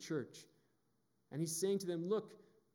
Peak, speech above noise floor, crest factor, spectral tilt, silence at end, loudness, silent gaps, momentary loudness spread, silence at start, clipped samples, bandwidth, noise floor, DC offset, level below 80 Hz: -26 dBFS; 41 dB; 16 dB; -5 dB/octave; 0.35 s; -40 LUFS; none; 18 LU; 0 s; under 0.1%; 18 kHz; -81 dBFS; under 0.1%; under -90 dBFS